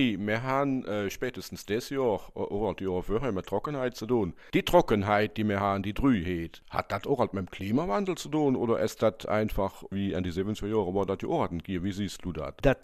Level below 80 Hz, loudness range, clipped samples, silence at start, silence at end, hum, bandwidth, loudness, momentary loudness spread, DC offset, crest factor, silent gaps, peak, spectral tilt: -46 dBFS; 4 LU; under 0.1%; 0 s; 0.05 s; none; 15 kHz; -29 LUFS; 7 LU; under 0.1%; 22 dB; none; -8 dBFS; -6.5 dB/octave